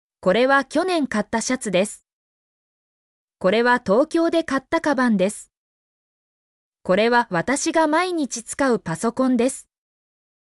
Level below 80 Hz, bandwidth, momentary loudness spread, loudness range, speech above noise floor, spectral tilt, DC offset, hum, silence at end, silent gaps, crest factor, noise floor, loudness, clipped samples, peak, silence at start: -58 dBFS; 12 kHz; 7 LU; 2 LU; over 70 dB; -4.5 dB/octave; under 0.1%; none; 0.85 s; 2.13-3.28 s, 5.57-6.72 s; 14 dB; under -90 dBFS; -20 LUFS; under 0.1%; -8 dBFS; 0.25 s